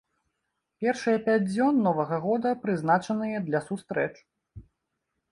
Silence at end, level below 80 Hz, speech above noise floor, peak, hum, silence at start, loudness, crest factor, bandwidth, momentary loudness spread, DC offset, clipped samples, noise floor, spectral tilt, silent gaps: 0.7 s; -64 dBFS; 55 dB; -10 dBFS; none; 0.8 s; -27 LUFS; 16 dB; 11 kHz; 7 LU; under 0.1%; under 0.1%; -81 dBFS; -7 dB/octave; none